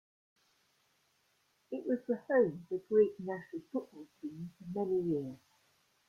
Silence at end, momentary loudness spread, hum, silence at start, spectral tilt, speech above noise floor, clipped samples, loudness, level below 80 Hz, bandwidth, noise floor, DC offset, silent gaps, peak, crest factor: 0.7 s; 17 LU; none; 1.7 s; -9 dB/octave; 41 dB; under 0.1%; -35 LUFS; -76 dBFS; 6.8 kHz; -75 dBFS; under 0.1%; none; -18 dBFS; 20 dB